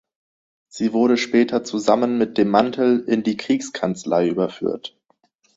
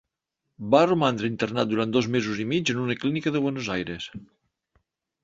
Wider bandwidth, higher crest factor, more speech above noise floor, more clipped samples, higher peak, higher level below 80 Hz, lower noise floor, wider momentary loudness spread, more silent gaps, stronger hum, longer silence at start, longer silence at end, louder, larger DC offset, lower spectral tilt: about the same, 8 kHz vs 7.8 kHz; about the same, 18 dB vs 22 dB; second, 44 dB vs 57 dB; neither; about the same, -2 dBFS vs -4 dBFS; about the same, -62 dBFS vs -60 dBFS; second, -64 dBFS vs -82 dBFS; second, 8 LU vs 13 LU; neither; neither; first, 0.75 s vs 0.6 s; second, 0.7 s vs 1 s; first, -20 LUFS vs -25 LUFS; neither; about the same, -5.5 dB/octave vs -5.5 dB/octave